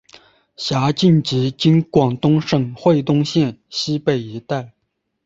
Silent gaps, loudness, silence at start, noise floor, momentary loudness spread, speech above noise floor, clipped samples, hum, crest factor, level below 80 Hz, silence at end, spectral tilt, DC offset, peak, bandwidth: none; -18 LUFS; 0.6 s; -73 dBFS; 10 LU; 56 dB; under 0.1%; none; 18 dB; -54 dBFS; 0.55 s; -6.5 dB/octave; under 0.1%; 0 dBFS; 7.8 kHz